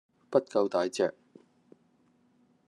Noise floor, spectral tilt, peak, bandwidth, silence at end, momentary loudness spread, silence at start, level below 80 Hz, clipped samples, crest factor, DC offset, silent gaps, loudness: -68 dBFS; -5 dB/octave; -10 dBFS; 11.5 kHz; 1.55 s; 4 LU; 0.3 s; -84 dBFS; under 0.1%; 22 dB; under 0.1%; none; -30 LUFS